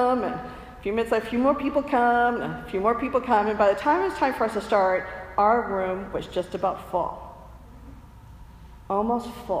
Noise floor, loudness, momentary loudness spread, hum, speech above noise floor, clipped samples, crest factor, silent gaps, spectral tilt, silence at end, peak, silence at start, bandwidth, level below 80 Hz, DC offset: -45 dBFS; -24 LUFS; 9 LU; none; 22 dB; under 0.1%; 18 dB; none; -6 dB/octave; 0 s; -8 dBFS; 0 s; 15.5 kHz; -48 dBFS; under 0.1%